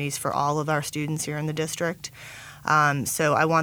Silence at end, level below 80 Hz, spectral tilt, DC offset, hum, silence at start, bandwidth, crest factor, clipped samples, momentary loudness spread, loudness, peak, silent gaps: 0 s; -60 dBFS; -4.5 dB/octave; under 0.1%; none; 0 s; 19.5 kHz; 18 dB; under 0.1%; 15 LU; -25 LUFS; -6 dBFS; none